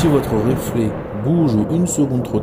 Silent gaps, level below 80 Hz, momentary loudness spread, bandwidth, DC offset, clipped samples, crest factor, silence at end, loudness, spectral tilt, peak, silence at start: none; -38 dBFS; 5 LU; 16 kHz; under 0.1%; under 0.1%; 14 dB; 0 s; -18 LUFS; -7 dB/octave; -4 dBFS; 0 s